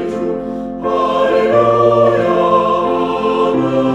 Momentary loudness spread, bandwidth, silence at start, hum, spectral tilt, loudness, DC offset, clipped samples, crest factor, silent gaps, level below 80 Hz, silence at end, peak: 9 LU; 9.4 kHz; 0 s; none; -7 dB/octave; -14 LUFS; under 0.1%; under 0.1%; 14 dB; none; -44 dBFS; 0 s; 0 dBFS